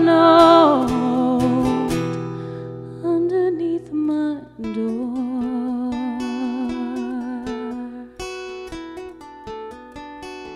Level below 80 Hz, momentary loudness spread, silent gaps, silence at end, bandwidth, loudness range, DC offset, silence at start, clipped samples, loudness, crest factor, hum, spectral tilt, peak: -48 dBFS; 21 LU; none; 0 s; 12.5 kHz; 12 LU; under 0.1%; 0 s; under 0.1%; -20 LUFS; 20 dB; none; -6.5 dB/octave; 0 dBFS